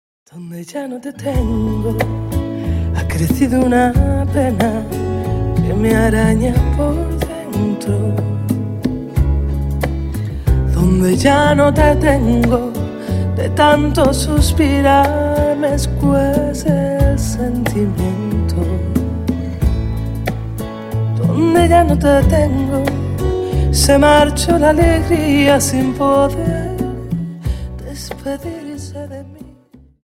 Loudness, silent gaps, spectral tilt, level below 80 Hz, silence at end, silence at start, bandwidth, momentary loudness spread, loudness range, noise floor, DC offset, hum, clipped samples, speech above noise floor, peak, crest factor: -15 LUFS; none; -6 dB/octave; -22 dBFS; 0.5 s; 0.35 s; 16.5 kHz; 12 LU; 6 LU; -45 dBFS; under 0.1%; none; under 0.1%; 32 dB; 0 dBFS; 14 dB